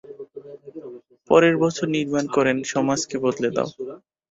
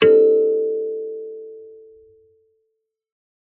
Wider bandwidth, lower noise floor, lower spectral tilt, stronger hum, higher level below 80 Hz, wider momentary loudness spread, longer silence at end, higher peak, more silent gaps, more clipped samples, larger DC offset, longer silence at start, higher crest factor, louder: first, 8 kHz vs 3.9 kHz; second, -41 dBFS vs -75 dBFS; first, -5 dB/octave vs -3.5 dB/octave; neither; first, -62 dBFS vs -72 dBFS; about the same, 22 LU vs 24 LU; second, 0.35 s vs 1.85 s; about the same, -2 dBFS vs -2 dBFS; neither; neither; neither; about the same, 0.05 s vs 0 s; about the same, 20 dB vs 18 dB; second, -21 LUFS vs -18 LUFS